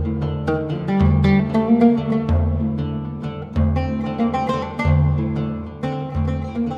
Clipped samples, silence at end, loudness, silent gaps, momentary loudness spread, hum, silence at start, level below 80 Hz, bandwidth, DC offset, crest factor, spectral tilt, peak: under 0.1%; 0 s; -20 LUFS; none; 11 LU; none; 0 s; -30 dBFS; 7 kHz; under 0.1%; 16 dB; -9.5 dB/octave; -4 dBFS